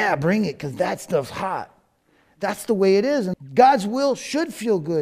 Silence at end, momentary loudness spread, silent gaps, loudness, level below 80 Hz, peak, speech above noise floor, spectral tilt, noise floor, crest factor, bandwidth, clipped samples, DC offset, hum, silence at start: 0 s; 12 LU; none; -21 LUFS; -60 dBFS; -2 dBFS; 41 dB; -5.5 dB/octave; -62 dBFS; 18 dB; 15.5 kHz; under 0.1%; under 0.1%; none; 0 s